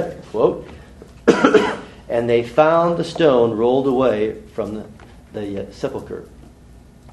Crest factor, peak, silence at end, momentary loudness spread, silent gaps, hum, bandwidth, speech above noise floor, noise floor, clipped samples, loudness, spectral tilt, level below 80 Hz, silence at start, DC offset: 18 dB; 0 dBFS; 0 s; 17 LU; none; none; 12 kHz; 26 dB; -44 dBFS; under 0.1%; -18 LUFS; -6.5 dB/octave; -46 dBFS; 0 s; under 0.1%